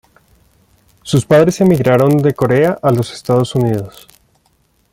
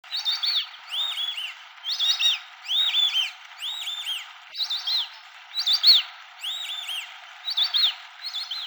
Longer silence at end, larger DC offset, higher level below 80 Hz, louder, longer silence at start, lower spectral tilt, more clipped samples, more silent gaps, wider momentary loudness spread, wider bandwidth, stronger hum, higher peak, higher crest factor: first, 1.05 s vs 0 s; neither; first, -48 dBFS vs under -90 dBFS; first, -13 LUFS vs -23 LUFS; first, 1.05 s vs 0.05 s; first, -7 dB/octave vs 7 dB/octave; neither; neither; second, 7 LU vs 15 LU; second, 16.5 kHz vs over 20 kHz; neither; first, 0 dBFS vs -6 dBFS; second, 14 dB vs 20 dB